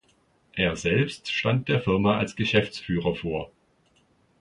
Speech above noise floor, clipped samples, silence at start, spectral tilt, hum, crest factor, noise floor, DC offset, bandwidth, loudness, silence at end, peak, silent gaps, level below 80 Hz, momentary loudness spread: 40 dB; under 0.1%; 0.55 s; -6 dB/octave; none; 20 dB; -64 dBFS; under 0.1%; 11 kHz; -25 LUFS; 0.95 s; -8 dBFS; none; -50 dBFS; 9 LU